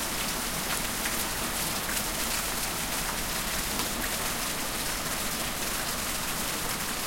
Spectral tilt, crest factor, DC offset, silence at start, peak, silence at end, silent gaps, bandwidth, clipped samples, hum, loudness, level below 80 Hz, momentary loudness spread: -1.5 dB/octave; 24 dB; under 0.1%; 0 s; -6 dBFS; 0 s; none; 16.5 kHz; under 0.1%; none; -29 LUFS; -44 dBFS; 1 LU